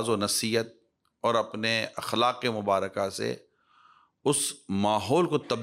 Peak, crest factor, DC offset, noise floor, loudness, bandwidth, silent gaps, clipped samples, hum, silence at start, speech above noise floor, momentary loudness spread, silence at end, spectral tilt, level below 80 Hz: -12 dBFS; 16 dB; under 0.1%; -61 dBFS; -27 LUFS; 16 kHz; none; under 0.1%; none; 0 s; 34 dB; 7 LU; 0 s; -3.5 dB/octave; -72 dBFS